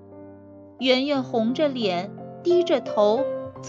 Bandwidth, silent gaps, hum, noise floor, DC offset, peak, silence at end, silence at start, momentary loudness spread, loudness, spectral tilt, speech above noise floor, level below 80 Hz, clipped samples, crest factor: 7.6 kHz; none; none; -45 dBFS; under 0.1%; -6 dBFS; 0 s; 0 s; 9 LU; -23 LUFS; -5.5 dB/octave; 23 dB; -70 dBFS; under 0.1%; 18 dB